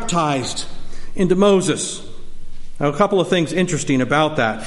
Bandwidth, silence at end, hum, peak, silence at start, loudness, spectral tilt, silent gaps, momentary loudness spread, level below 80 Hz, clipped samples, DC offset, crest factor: 11.5 kHz; 0 s; none; -2 dBFS; 0 s; -18 LUFS; -5 dB/octave; none; 15 LU; -34 dBFS; under 0.1%; under 0.1%; 16 dB